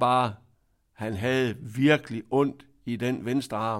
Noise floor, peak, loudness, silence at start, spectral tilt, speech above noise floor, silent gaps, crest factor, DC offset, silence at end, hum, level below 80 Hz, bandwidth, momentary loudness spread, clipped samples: -67 dBFS; -8 dBFS; -27 LUFS; 0 s; -6.5 dB/octave; 41 dB; none; 18 dB; under 0.1%; 0 s; none; -62 dBFS; 15.5 kHz; 12 LU; under 0.1%